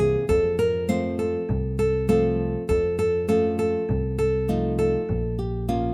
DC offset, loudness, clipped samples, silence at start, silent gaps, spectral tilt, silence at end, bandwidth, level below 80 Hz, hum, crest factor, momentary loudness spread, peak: under 0.1%; -24 LUFS; under 0.1%; 0 s; none; -8 dB/octave; 0 s; 13.5 kHz; -34 dBFS; none; 14 dB; 5 LU; -8 dBFS